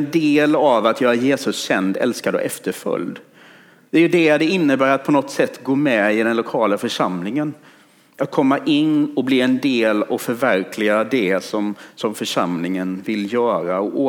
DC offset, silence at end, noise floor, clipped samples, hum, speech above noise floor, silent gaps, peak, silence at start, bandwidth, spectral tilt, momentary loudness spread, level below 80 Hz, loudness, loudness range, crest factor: under 0.1%; 0 s; -47 dBFS; under 0.1%; none; 29 dB; none; -2 dBFS; 0 s; 17.5 kHz; -5 dB/octave; 9 LU; -72 dBFS; -18 LUFS; 3 LU; 16 dB